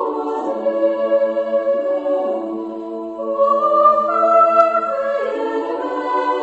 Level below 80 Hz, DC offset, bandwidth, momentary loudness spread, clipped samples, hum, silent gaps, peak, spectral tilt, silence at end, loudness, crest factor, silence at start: -64 dBFS; under 0.1%; 8 kHz; 11 LU; under 0.1%; none; none; 0 dBFS; -5.5 dB/octave; 0 s; -17 LUFS; 16 dB; 0 s